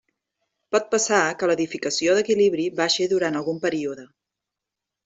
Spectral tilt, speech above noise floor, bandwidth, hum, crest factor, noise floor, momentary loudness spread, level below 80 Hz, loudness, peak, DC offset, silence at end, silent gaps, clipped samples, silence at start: -3 dB/octave; 64 dB; 8.2 kHz; none; 20 dB; -86 dBFS; 6 LU; -68 dBFS; -22 LUFS; -4 dBFS; under 0.1%; 1 s; none; under 0.1%; 0.7 s